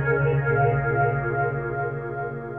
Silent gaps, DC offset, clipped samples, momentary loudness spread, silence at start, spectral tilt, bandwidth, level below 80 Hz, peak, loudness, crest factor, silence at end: none; under 0.1%; under 0.1%; 9 LU; 0 s; -11.5 dB/octave; 3.5 kHz; -44 dBFS; -10 dBFS; -24 LUFS; 14 dB; 0 s